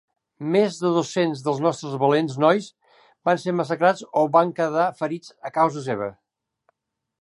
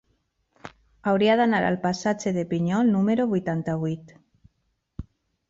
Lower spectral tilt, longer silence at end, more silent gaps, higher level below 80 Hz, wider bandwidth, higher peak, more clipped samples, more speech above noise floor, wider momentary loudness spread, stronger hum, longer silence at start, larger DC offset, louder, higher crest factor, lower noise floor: about the same, -6 dB/octave vs -6.5 dB/octave; first, 1.1 s vs 0.5 s; neither; second, -72 dBFS vs -54 dBFS; first, 11.5 kHz vs 7.8 kHz; first, -4 dBFS vs -10 dBFS; neither; about the same, 49 dB vs 51 dB; second, 10 LU vs 19 LU; neither; second, 0.4 s vs 0.65 s; neither; about the same, -22 LUFS vs -24 LUFS; about the same, 20 dB vs 16 dB; about the same, -71 dBFS vs -74 dBFS